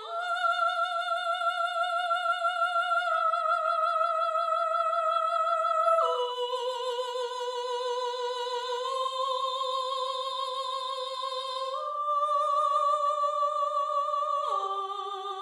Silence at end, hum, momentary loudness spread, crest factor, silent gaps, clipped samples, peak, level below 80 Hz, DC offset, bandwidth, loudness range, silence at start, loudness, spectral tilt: 0 s; none; 7 LU; 16 dB; none; under 0.1%; -14 dBFS; under -90 dBFS; under 0.1%; 12.5 kHz; 5 LU; 0 s; -28 LUFS; 2.5 dB/octave